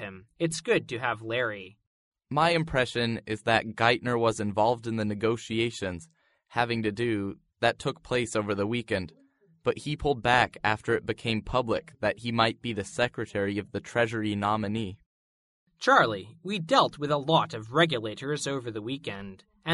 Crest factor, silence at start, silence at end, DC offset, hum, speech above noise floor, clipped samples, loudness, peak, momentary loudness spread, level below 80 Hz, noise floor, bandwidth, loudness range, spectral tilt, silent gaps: 22 dB; 0 s; 0 s; under 0.1%; none; over 62 dB; under 0.1%; -28 LUFS; -6 dBFS; 11 LU; -54 dBFS; under -90 dBFS; 11.5 kHz; 4 LU; -5 dB/octave; 1.87-2.12 s, 15.06-15.67 s